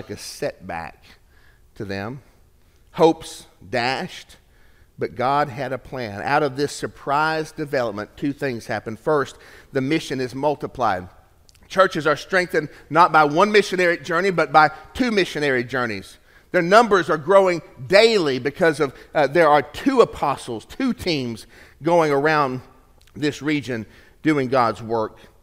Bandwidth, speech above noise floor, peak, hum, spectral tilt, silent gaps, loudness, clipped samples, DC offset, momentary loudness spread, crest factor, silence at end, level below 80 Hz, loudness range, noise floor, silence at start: 16 kHz; 34 dB; 0 dBFS; none; -5 dB/octave; none; -20 LUFS; under 0.1%; under 0.1%; 15 LU; 22 dB; 0.35 s; -52 dBFS; 7 LU; -54 dBFS; 0.1 s